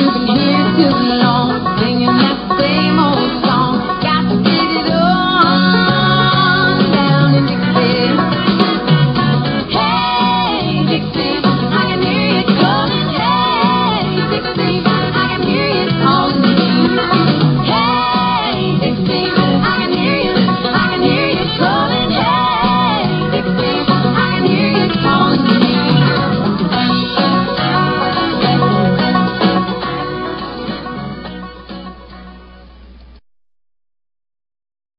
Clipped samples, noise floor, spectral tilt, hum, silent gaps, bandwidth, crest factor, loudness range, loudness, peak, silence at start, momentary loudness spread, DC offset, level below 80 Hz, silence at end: under 0.1%; -38 dBFS; -9.5 dB/octave; none; none; 5.6 kHz; 14 dB; 4 LU; -13 LUFS; 0 dBFS; 0 s; 4 LU; under 0.1%; -38 dBFS; 1.95 s